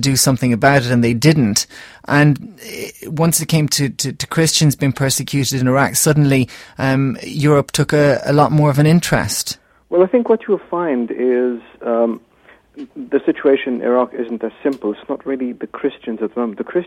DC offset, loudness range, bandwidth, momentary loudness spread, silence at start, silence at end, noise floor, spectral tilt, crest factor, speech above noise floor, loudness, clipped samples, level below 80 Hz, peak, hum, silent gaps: under 0.1%; 5 LU; 16.5 kHz; 11 LU; 0 s; 0 s; -49 dBFS; -5 dB/octave; 16 dB; 33 dB; -16 LUFS; under 0.1%; -46 dBFS; 0 dBFS; none; none